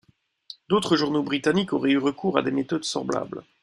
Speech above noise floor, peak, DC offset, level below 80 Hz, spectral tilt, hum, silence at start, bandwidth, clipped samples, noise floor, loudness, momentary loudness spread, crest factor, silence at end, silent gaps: 24 dB; -4 dBFS; under 0.1%; -64 dBFS; -5 dB/octave; none; 0.7 s; 11.5 kHz; under 0.1%; -48 dBFS; -24 LUFS; 8 LU; 20 dB; 0.2 s; none